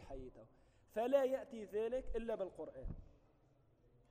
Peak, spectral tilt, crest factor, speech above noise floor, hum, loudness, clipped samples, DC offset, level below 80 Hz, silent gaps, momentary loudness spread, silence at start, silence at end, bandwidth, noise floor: -22 dBFS; -6.5 dB/octave; 22 dB; 31 dB; none; -41 LUFS; under 0.1%; under 0.1%; -56 dBFS; none; 18 LU; 0 s; 1 s; 15.5 kHz; -72 dBFS